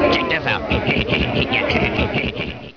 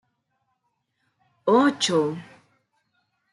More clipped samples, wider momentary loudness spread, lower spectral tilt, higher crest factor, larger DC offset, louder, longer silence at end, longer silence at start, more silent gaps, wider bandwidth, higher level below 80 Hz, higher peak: neither; second, 4 LU vs 11 LU; first, -6.5 dB/octave vs -4 dB/octave; second, 14 dB vs 20 dB; neither; first, -19 LUFS vs -22 LUFS; second, 0.05 s vs 1.1 s; second, 0 s vs 1.45 s; neither; second, 5.4 kHz vs 11.5 kHz; first, -34 dBFS vs -76 dBFS; first, -4 dBFS vs -8 dBFS